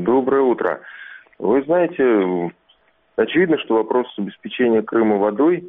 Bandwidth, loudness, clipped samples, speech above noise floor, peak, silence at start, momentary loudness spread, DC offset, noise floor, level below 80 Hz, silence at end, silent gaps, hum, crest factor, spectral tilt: 3.9 kHz; -19 LUFS; under 0.1%; 41 dB; -4 dBFS; 0 s; 12 LU; under 0.1%; -59 dBFS; -60 dBFS; 0 s; none; none; 14 dB; -5 dB/octave